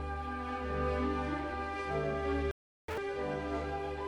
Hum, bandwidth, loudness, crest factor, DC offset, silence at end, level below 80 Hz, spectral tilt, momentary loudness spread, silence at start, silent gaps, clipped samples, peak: none; 11.5 kHz; -36 LUFS; 14 dB; under 0.1%; 0 s; -44 dBFS; -7 dB/octave; 5 LU; 0 s; 2.51-2.88 s; under 0.1%; -22 dBFS